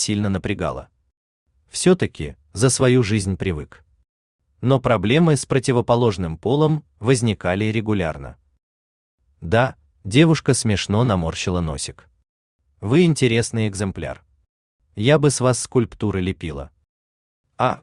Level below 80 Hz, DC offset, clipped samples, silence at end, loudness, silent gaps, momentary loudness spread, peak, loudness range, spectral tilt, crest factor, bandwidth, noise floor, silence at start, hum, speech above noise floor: -46 dBFS; under 0.1%; under 0.1%; 0.05 s; -20 LUFS; 1.17-1.46 s, 4.09-4.39 s, 8.63-9.18 s, 12.29-12.59 s, 14.49-14.79 s, 16.89-17.44 s; 15 LU; -2 dBFS; 3 LU; -5.5 dB/octave; 18 dB; 12.5 kHz; under -90 dBFS; 0 s; none; over 71 dB